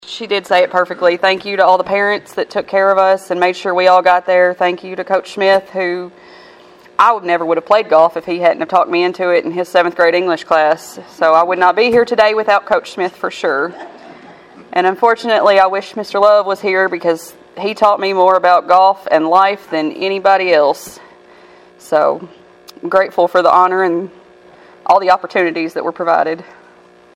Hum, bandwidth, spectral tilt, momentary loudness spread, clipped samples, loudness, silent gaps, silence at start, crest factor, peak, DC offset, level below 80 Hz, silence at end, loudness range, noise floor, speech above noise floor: none; 15 kHz; -4.5 dB/octave; 10 LU; under 0.1%; -13 LUFS; none; 0.05 s; 14 dB; 0 dBFS; under 0.1%; -60 dBFS; 0.75 s; 3 LU; -44 dBFS; 31 dB